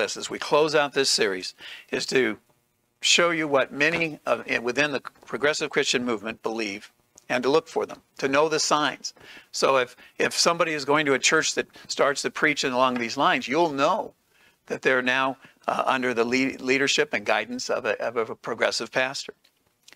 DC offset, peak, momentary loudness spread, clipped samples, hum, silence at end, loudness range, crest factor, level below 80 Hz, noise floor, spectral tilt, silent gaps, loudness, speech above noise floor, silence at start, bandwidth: under 0.1%; -4 dBFS; 11 LU; under 0.1%; none; 0.65 s; 3 LU; 20 dB; -68 dBFS; -69 dBFS; -2.5 dB/octave; none; -24 LUFS; 45 dB; 0 s; 16 kHz